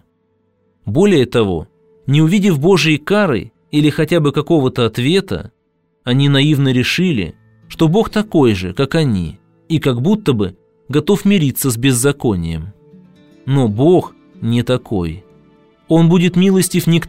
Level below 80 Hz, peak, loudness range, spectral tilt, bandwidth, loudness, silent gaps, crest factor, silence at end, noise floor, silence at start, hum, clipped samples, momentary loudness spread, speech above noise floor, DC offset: -42 dBFS; 0 dBFS; 3 LU; -6 dB/octave; 16 kHz; -14 LUFS; none; 14 dB; 0 s; -61 dBFS; 0.85 s; none; under 0.1%; 13 LU; 48 dB; 0.4%